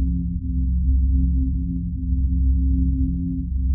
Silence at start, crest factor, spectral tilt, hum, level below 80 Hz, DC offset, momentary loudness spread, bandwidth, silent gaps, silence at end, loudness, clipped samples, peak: 0 s; 10 dB; -24.5 dB/octave; none; -20 dBFS; under 0.1%; 5 LU; 0.4 kHz; none; 0 s; -23 LUFS; under 0.1%; -10 dBFS